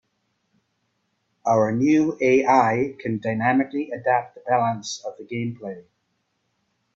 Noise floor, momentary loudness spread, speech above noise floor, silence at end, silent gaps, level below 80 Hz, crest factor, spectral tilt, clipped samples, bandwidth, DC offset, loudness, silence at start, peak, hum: -73 dBFS; 13 LU; 51 dB; 1.15 s; none; -66 dBFS; 20 dB; -6 dB/octave; under 0.1%; 7.8 kHz; under 0.1%; -22 LUFS; 1.45 s; -4 dBFS; none